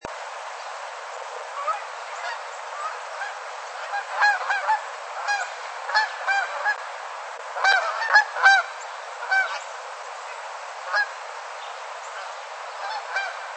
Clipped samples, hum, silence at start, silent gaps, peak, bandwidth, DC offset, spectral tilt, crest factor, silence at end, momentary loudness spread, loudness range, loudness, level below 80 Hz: under 0.1%; none; 0 s; none; -4 dBFS; 8.8 kHz; under 0.1%; 2 dB/octave; 22 dB; 0 s; 16 LU; 10 LU; -25 LUFS; -74 dBFS